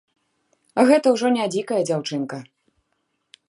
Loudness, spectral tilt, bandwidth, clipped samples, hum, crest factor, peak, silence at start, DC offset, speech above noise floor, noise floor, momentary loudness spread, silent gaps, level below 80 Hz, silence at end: -20 LUFS; -5 dB/octave; 11.5 kHz; under 0.1%; none; 20 dB; -2 dBFS; 0.75 s; under 0.1%; 53 dB; -73 dBFS; 13 LU; none; -76 dBFS; 1.05 s